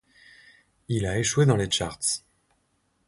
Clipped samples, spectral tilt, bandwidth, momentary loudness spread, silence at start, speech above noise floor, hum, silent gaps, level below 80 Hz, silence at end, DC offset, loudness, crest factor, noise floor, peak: under 0.1%; -4 dB/octave; 11.5 kHz; 9 LU; 0.9 s; 47 dB; none; none; -50 dBFS; 0.9 s; under 0.1%; -25 LUFS; 20 dB; -71 dBFS; -8 dBFS